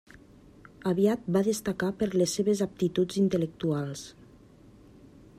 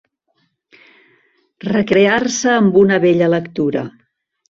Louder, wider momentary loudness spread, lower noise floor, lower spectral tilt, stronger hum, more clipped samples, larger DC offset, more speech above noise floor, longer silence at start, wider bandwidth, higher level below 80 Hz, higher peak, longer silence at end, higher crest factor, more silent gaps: second, -28 LUFS vs -14 LUFS; about the same, 8 LU vs 10 LU; second, -54 dBFS vs -65 dBFS; about the same, -6 dB/octave vs -5 dB/octave; neither; neither; neither; second, 27 dB vs 52 dB; second, 0.8 s vs 1.65 s; first, 15.5 kHz vs 7.6 kHz; second, -60 dBFS vs -54 dBFS; second, -12 dBFS vs -2 dBFS; first, 1.3 s vs 0.6 s; about the same, 18 dB vs 16 dB; neither